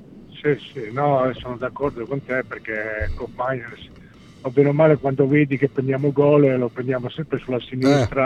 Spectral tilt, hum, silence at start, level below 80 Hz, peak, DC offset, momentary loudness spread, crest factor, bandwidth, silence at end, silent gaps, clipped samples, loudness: -8 dB/octave; none; 0 s; -42 dBFS; -2 dBFS; under 0.1%; 13 LU; 18 dB; 9 kHz; 0 s; none; under 0.1%; -21 LUFS